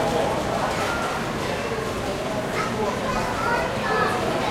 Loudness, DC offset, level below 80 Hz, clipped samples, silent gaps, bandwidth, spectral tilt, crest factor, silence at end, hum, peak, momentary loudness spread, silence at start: -24 LUFS; under 0.1%; -42 dBFS; under 0.1%; none; 16.5 kHz; -4.5 dB/octave; 16 dB; 0 s; none; -8 dBFS; 4 LU; 0 s